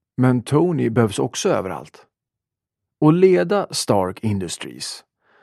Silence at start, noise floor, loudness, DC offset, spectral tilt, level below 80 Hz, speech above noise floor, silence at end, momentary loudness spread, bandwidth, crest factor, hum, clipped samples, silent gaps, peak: 0.2 s; -86 dBFS; -19 LUFS; under 0.1%; -6 dB/octave; -60 dBFS; 67 dB; 0.45 s; 15 LU; 14 kHz; 18 dB; none; under 0.1%; none; -2 dBFS